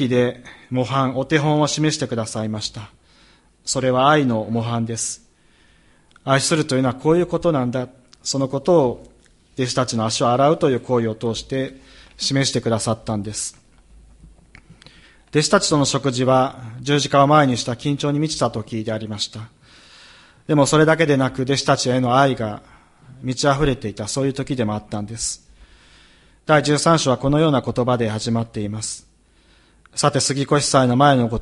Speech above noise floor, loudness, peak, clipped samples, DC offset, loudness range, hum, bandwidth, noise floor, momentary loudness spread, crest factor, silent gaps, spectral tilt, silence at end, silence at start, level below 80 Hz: 36 dB; -19 LUFS; 0 dBFS; under 0.1%; under 0.1%; 5 LU; none; 11.5 kHz; -55 dBFS; 12 LU; 20 dB; none; -5 dB/octave; 0 s; 0 s; -48 dBFS